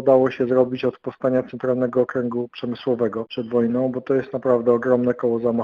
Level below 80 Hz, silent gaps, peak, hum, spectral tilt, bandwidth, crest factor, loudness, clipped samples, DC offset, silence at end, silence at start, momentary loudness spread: -62 dBFS; none; -4 dBFS; none; -9 dB/octave; 5.8 kHz; 18 dB; -21 LUFS; under 0.1%; under 0.1%; 0 s; 0 s; 8 LU